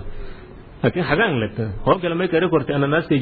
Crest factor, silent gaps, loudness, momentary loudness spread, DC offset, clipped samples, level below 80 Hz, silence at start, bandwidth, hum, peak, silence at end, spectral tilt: 18 dB; none; -20 LUFS; 12 LU; under 0.1%; under 0.1%; -38 dBFS; 0 s; 4.9 kHz; none; -4 dBFS; 0 s; -10.5 dB/octave